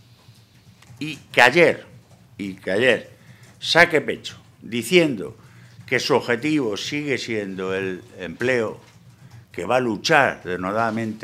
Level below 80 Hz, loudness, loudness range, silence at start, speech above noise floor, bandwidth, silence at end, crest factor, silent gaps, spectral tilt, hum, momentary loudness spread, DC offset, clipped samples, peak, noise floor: -62 dBFS; -20 LUFS; 6 LU; 0.3 s; 30 dB; 16 kHz; 0 s; 22 dB; none; -4.5 dB/octave; none; 17 LU; under 0.1%; under 0.1%; 0 dBFS; -51 dBFS